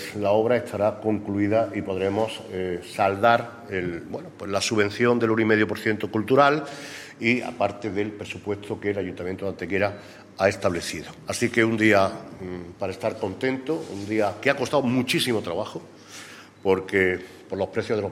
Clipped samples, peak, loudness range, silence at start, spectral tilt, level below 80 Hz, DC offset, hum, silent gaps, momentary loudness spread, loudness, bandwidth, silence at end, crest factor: under 0.1%; -2 dBFS; 5 LU; 0 s; -5 dB/octave; -60 dBFS; under 0.1%; none; none; 14 LU; -24 LUFS; 16 kHz; 0 s; 22 dB